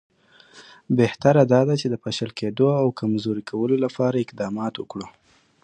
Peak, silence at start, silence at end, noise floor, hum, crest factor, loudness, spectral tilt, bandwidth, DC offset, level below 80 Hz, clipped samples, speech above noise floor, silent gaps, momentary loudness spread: -2 dBFS; 0.55 s; 0.55 s; -51 dBFS; none; 20 dB; -22 LUFS; -7 dB/octave; 9.8 kHz; under 0.1%; -60 dBFS; under 0.1%; 30 dB; none; 11 LU